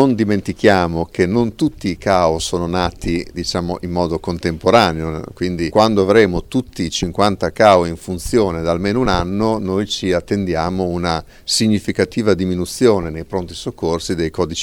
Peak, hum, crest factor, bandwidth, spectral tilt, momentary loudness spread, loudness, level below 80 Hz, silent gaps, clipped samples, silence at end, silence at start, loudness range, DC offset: 0 dBFS; none; 16 dB; 17.5 kHz; -5.5 dB/octave; 9 LU; -17 LUFS; -36 dBFS; none; under 0.1%; 0 s; 0 s; 3 LU; under 0.1%